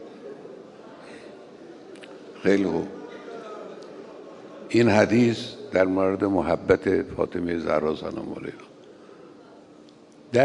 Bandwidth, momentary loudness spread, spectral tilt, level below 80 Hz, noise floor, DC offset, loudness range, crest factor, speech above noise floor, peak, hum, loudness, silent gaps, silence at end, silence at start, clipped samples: 11 kHz; 23 LU; -6.5 dB/octave; -58 dBFS; -50 dBFS; under 0.1%; 8 LU; 22 dB; 27 dB; -4 dBFS; none; -24 LUFS; none; 0 s; 0 s; under 0.1%